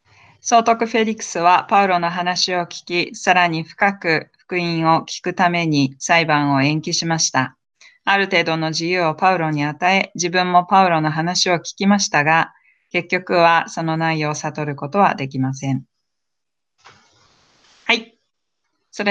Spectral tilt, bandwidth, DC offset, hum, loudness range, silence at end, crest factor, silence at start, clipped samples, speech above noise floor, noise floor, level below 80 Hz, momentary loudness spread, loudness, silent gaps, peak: -4 dB/octave; 9.4 kHz; under 0.1%; none; 7 LU; 0 s; 18 dB; 0.45 s; under 0.1%; 65 dB; -83 dBFS; -66 dBFS; 9 LU; -18 LUFS; none; -2 dBFS